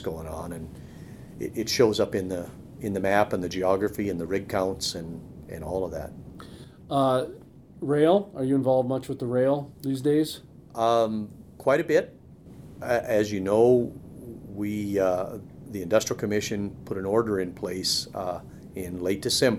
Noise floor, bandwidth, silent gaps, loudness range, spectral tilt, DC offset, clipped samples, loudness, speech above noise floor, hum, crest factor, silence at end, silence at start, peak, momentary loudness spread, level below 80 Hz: -47 dBFS; 16 kHz; none; 4 LU; -5 dB/octave; under 0.1%; under 0.1%; -26 LUFS; 21 dB; none; 20 dB; 0 s; 0 s; -6 dBFS; 19 LU; -54 dBFS